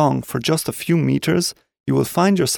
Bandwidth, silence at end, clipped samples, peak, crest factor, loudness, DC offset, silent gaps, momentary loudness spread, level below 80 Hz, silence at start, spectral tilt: 19 kHz; 0 s; under 0.1%; -4 dBFS; 14 dB; -19 LUFS; under 0.1%; 1.80-1.84 s; 5 LU; -52 dBFS; 0 s; -5 dB/octave